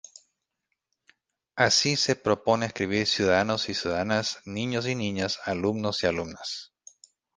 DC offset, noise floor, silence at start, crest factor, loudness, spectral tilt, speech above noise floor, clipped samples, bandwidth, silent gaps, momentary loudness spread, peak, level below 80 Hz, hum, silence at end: under 0.1%; -81 dBFS; 1.55 s; 22 dB; -26 LUFS; -3.5 dB/octave; 55 dB; under 0.1%; 10.5 kHz; none; 11 LU; -6 dBFS; -56 dBFS; none; 0.7 s